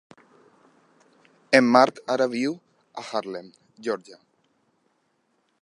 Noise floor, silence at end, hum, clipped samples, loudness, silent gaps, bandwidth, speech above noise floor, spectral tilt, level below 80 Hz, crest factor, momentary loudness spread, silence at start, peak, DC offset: -70 dBFS; 1.5 s; none; under 0.1%; -23 LUFS; none; 11.5 kHz; 48 dB; -4.5 dB/octave; -74 dBFS; 24 dB; 21 LU; 1.5 s; -2 dBFS; under 0.1%